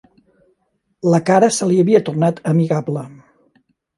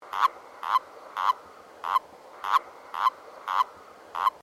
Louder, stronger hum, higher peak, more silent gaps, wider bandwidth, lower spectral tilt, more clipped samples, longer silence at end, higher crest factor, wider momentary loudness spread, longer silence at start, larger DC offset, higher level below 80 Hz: first, -16 LUFS vs -29 LUFS; neither; first, 0 dBFS vs -10 dBFS; neither; second, 11.5 kHz vs 15.5 kHz; first, -6.5 dB/octave vs -0.5 dB/octave; neither; first, 0.85 s vs 0.05 s; about the same, 18 dB vs 20 dB; about the same, 11 LU vs 12 LU; first, 1.05 s vs 0 s; neither; first, -64 dBFS vs -78 dBFS